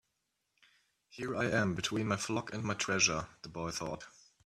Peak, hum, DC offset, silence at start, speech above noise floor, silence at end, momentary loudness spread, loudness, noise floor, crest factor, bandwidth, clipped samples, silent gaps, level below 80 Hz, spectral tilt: -16 dBFS; none; under 0.1%; 1.15 s; 48 dB; 0.35 s; 14 LU; -34 LUFS; -83 dBFS; 22 dB; 15 kHz; under 0.1%; none; -64 dBFS; -3.5 dB/octave